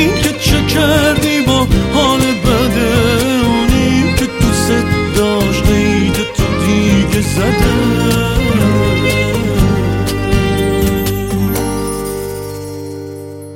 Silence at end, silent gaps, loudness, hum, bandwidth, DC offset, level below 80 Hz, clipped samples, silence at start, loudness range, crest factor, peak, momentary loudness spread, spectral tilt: 0 s; none; -13 LUFS; none; 17 kHz; under 0.1%; -22 dBFS; under 0.1%; 0 s; 3 LU; 12 dB; 0 dBFS; 8 LU; -5 dB/octave